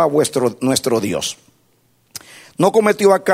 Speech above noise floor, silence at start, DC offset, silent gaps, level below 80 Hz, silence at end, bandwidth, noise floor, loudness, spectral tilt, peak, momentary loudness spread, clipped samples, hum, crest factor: 43 dB; 0 s; under 0.1%; none; -58 dBFS; 0 s; 16 kHz; -59 dBFS; -16 LUFS; -4 dB/octave; 0 dBFS; 22 LU; under 0.1%; none; 16 dB